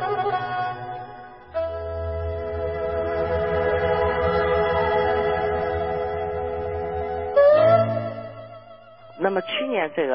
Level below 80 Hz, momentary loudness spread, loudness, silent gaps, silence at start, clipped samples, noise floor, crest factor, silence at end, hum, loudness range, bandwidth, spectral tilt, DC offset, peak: -40 dBFS; 14 LU; -23 LUFS; none; 0 s; under 0.1%; -46 dBFS; 16 dB; 0 s; none; 6 LU; 5.6 kHz; -10.5 dB/octave; 0.1%; -6 dBFS